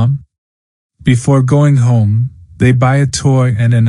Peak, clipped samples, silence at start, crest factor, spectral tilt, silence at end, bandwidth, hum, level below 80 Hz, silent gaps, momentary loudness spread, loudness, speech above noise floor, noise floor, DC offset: 0 dBFS; under 0.1%; 0 s; 10 dB; -7 dB/octave; 0 s; 11.5 kHz; none; -42 dBFS; 0.38-0.90 s; 7 LU; -12 LUFS; over 80 dB; under -90 dBFS; under 0.1%